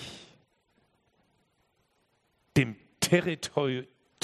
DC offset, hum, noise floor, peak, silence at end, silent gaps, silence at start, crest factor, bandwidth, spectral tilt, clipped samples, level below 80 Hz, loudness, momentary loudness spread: under 0.1%; none; -72 dBFS; -8 dBFS; 0.4 s; none; 0 s; 24 dB; 13 kHz; -4.5 dB/octave; under 0.1%; -64 dBFS; -29 LUFS; 14 LU